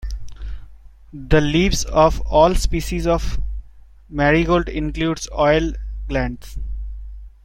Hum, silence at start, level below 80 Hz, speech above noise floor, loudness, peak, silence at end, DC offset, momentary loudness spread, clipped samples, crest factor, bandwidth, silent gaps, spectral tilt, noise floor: none; 0 s; -26 dBFS; 22 dB; -19 LUFS; -2 dBFS; 0.15 s; under 0.1%; 20 LU; under 0.1%; 18 dB; 16.5 kHz; none; -5.5 dB/octave; -40 dBFS